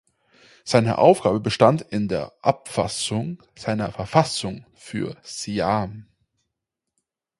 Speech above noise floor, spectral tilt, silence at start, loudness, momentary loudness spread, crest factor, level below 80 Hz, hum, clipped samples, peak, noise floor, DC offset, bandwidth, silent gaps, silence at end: 61 dB; -5.5 dB/octave; 0.65 s; -22 LUFS; 16 LU; 22 dB; -52 dBFS; none; under 0.1%; 0 dBFS; -83 dBFS; under 0.1%; 11.5 kHz; none; 1.4 s